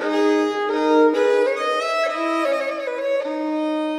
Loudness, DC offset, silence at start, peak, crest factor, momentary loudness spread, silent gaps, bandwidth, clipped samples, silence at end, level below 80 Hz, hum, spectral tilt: -20 LUFS; under 0.1%; 0 s; -6 dBFS; 14 dB; 7 LU; none; 12 kHz; under 0.1%; 0 s; -68 dBFS; none; -2.5 dB/octave